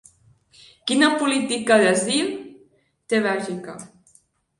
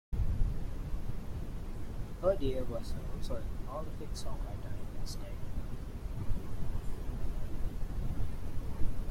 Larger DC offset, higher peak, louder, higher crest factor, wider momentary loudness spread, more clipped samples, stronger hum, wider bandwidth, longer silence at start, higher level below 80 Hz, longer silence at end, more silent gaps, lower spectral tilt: neither; first, -4 dBFS vs -16 dBFS; first, -20 LUFS vs -40 LUFS; about the same, 18 dB vs 16 dB; first, 17 LU vs 9 LU; neither; neither; second, 11.5 kHz vs 13.5 kHz; first, 0.85 s vs 0.1 s; second, -68 dBFS vs -38 dBFS; first, 0.75 s vs 0 s; neither; second, -3 dB/octave vs -7 dB/octave